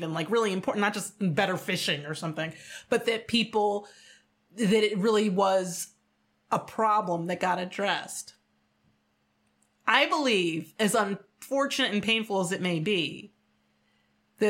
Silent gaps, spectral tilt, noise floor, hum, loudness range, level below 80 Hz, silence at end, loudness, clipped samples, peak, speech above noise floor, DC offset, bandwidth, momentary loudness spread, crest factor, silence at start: none; -4 dB/octave; -72 dBFS; none; 4 LU; -72 dBFS; 0 s; -27 LUFS; under 0.1%; -6 dBFS; 44 dB; under 0.1%; 16.5 kHz; 11 LU; 22 dB; 0 s